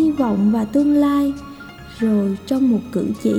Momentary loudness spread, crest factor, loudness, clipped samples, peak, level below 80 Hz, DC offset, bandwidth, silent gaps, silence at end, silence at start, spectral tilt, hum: 17 LU; 12 dB; -18 LUFS; under 0.1%; -6 dBFS; -46 dBFS; under 0.1%; 15.5 kHz; none; 0 s; 0 s; -7.5 dB/octave; none